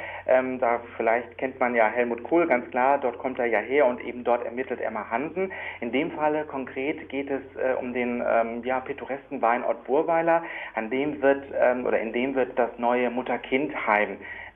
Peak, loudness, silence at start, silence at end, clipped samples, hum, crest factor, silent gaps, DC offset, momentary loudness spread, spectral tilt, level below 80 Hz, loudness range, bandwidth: -8 dBFS; -26 LUFS; 0 s; 0.05 s; under 0.1%; none; 18 dB; none; under 0.1%; 8 LU; -8.5 dB/octave; -64 dBFS; 4 LU; 3.8 kHz